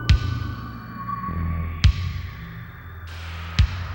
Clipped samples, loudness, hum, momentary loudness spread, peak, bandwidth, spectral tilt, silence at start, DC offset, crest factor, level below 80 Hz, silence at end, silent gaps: under 0.1%; -26 LUFS; none; 16 LU; -6 dBFS; 16 kHz; -6 dB/octave; 0 s; under 0.1%; 18 dB; -28 dBFS; 0 s; none